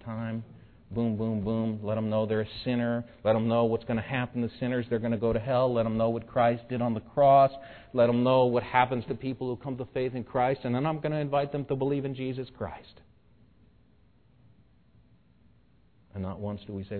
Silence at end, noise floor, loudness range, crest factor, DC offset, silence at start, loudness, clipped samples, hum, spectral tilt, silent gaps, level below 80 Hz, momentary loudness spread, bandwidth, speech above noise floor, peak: 0 s; -63 dBFS; 15 LU; 22 dB; under 0.1%; 0 s; -28 LUFS; under 0.1%; none; -11 dB/octave; none; -56 dBFS; 13 LU; 4.5 kHz; 35 dB; -8 dBFS